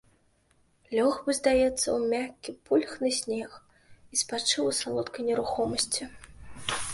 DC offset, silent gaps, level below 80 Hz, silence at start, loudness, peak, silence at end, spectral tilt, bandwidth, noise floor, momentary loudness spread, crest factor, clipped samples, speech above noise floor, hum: under 0.1%; none; -56 dBFS; 0.9 s; -28 LUFS; -10 dBFS; 0 s; -2.5 dB/octave; 11.5 kHz; -67 dBFS; 10 LU; 20 dB; under 0.1%; 39 dB; none